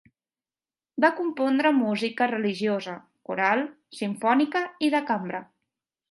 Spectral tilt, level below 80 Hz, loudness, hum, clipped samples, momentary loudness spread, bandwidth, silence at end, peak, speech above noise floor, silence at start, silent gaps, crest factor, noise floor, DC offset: -5.5 dB/octave; -80 dBFS; -25 LUFS; none; under 0.1%; 13 LU; 11.5 kHz; 0.7 s; -8 dBFS; over 65 dB; 0.95 s; none; 18 dB; under -90 dBFS; under 0.1%